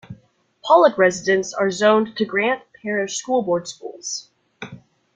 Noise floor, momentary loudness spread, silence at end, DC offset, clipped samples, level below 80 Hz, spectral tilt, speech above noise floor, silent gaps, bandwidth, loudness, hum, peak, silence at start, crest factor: -56 dBFS; 20 LU; 0.4 s; under 0.1%; under 0.1%; -64 dBFS; -3.5 dB/octave; 38 dB; none; 9.4 kHz; -19 LUFS; none; -2 dBFS; 0.1 s; 18 dB